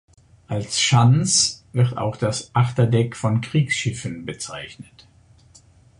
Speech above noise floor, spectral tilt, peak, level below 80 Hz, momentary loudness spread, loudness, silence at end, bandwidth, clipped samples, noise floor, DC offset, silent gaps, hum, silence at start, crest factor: 32 dB; -4.5 dB/octave; -4 dBFS; -52 dBFS; 15 LU; -20 LUFS; 1.15 s; 11 kHz; under 0.1%; -52 dBFS; under 0.1%; none; none; 0.5 s; 18 dB